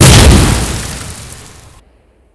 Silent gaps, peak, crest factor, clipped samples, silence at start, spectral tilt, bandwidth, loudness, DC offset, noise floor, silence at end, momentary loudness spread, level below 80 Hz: none; 0 dBFS; 10 dB; 4%; 0 s; -4 dB/octave; 11 kHz; -8 LUFS; under 0.1%; -48 dBFS; 1 s; 25 LU; -16 dBFS